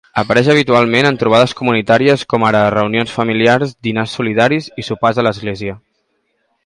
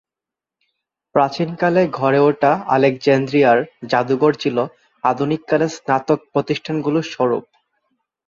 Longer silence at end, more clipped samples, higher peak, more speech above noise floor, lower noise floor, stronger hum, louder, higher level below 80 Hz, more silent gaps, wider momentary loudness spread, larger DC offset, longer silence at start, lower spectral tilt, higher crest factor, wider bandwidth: about the same, 0.9 s vs 0.85 s; neither; about the same, 0 dBFS vs -2 dBFS; second, 52 dB vs 70 dB; second, -65 dBFS vs -87 dBFS; neither; first, -13 LUFS vs -18 LUFS; first, -50 dBFS vs -62 dBFS; neither; about the same, 8 LU vs 6 LU; neither; second, 0.15 s vs 1.15 s; about the same, -6 dB/octave vs -6.5 dB/octave; about the same, 14 dB vs 16 dB; first, 11.5 kHz vs 7.4 kHz